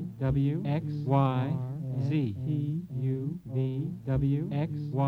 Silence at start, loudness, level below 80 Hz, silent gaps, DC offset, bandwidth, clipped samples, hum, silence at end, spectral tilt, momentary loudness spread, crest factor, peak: 0 s; -30 LUFS; -50 dBFS; none; under 0.1%; 5 kHz; under 0.1%; none; 0 s; -10 dB/octave; 7 LU; 18 dB; -12 dBFS